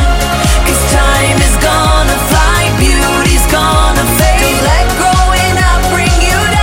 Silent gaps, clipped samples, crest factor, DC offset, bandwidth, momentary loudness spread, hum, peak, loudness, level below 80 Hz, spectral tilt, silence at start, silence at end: none; under 0.1%; 8 dB; under 0.1%; 17 kHz; 1 LU; none; 0 dBFS; -9 LUFS; -12 dBFS; -4 dB/octave; 0 s; 0 s